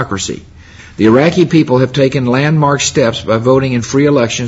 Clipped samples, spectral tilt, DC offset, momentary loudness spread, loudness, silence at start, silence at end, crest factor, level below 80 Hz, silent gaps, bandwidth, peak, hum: under 0.1%; -5.5 dB/octave; under 0.1%; 9 LU; -11 LUFS; 0 s; 0 s; 12 dB; -42 dBFS; none; 8 kHz; 0 dBFS; none